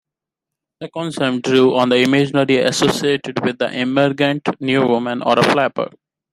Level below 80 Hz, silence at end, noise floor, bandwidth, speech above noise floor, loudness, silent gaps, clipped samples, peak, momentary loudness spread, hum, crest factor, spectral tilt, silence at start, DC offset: -60 dBFS; 0.45 s; -84 dBFS; 14 kHz; 68 dB; -16 LUFS; none; under 0.1%; 0 dBFS; 10 LU; none; 16 dB; -5 dB/octave; 0.8 s; under 0.1%